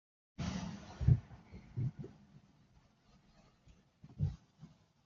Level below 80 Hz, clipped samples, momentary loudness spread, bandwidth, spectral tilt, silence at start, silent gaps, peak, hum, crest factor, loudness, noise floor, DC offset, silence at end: -52 dBFS; under 0.1%; 27 LU; 7.2 kHz; -8 dB/octave; 0.4 s; none; -16 dBFS; none; 26 dB; -39 LUFS; -68 dBFS; under 0.1%; 0.4 s